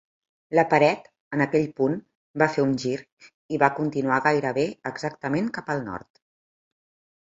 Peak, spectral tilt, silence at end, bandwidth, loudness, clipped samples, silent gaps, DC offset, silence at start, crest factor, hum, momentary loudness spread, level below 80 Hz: -2 dBFS; -6.5 dB/octave; 1.2 s; 7.8 kHz; -24 LUFS; under 0.1%; 1.20-1.31 s, 2.15-2.34 s, 3.12-3.17 s, 3.34-3.49 s; under 0.1%; 0.5 s; 24 dB; none; 12 LU; -64 dBFS